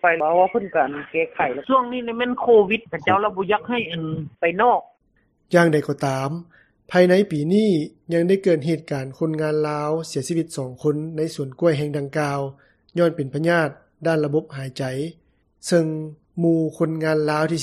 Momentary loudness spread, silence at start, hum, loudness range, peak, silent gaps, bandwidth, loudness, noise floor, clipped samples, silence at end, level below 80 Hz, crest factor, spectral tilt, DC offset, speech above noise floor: 10 LU; 0.05 s; none; 4 LU; -2 dBFS; none; 13.5 kHz; -21 LUFS; -64 dBFS; under 0.1%; 0 s; -60 dBFS; 18 dB; -6.5 dB/octave; under 0.1%; 44 dB